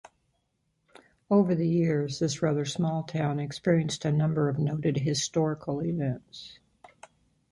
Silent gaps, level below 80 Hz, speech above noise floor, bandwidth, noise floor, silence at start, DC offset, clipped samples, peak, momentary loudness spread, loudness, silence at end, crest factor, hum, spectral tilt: none; -62 dBFS; 48 dB; 11.5 kHz; -75 dBFS; 1.3 s; under 0.1%; under 0.1%; -10 dBFS; 6 LU; -28 LUFS; 1 s; 18 dB; none; -6 dB/octave